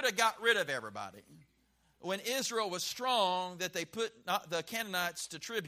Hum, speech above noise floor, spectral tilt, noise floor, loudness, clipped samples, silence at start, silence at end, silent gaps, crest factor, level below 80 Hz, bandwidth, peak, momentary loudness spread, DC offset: none; 37 dB; -1.5 dB/octave; -72 dBFS; -34 LUFS; under 0.1%; 0 s; 0 s; none; 22 dB; -78 dBFS; 15.5 kHz; -14 dBFS; 10 LU; under 0.1%